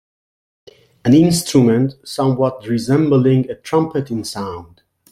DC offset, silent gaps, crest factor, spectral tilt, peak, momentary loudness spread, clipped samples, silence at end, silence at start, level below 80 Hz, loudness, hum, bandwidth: under 0.1%; none; 14 dB; -6.5 dB/octave; -2 dBFS; 12 LU; under 0.1%; 0.5 s; 1.05 s; -52 dBFS; -16 LUFS; none; 15 kHz